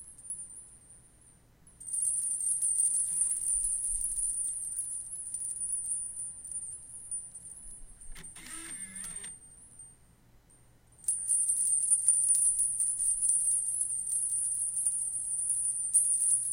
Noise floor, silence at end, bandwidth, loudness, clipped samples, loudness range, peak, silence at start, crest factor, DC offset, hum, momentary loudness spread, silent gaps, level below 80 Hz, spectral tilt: -61 dBFS; 0 s; 17 kHz; -28 LUFS; under 0.1%; 16 LU; -12 dBFS; 0 s; 20 dB; under 0.1%; none; 20 LU; none; -58 dBFS; 0.5 dB/octave